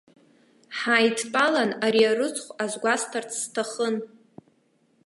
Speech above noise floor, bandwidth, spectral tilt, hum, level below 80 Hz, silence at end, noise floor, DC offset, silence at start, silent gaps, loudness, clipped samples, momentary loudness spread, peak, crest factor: 41 dB; 11.5 kHz; -2.5 dB/octave; none; -80 dBFS; 1 s; -65 dBFS; under 0.1%; 0.7 s; none; -24 LUFS; under 0.1%; 10 LU; -6 dBFS; 20 dB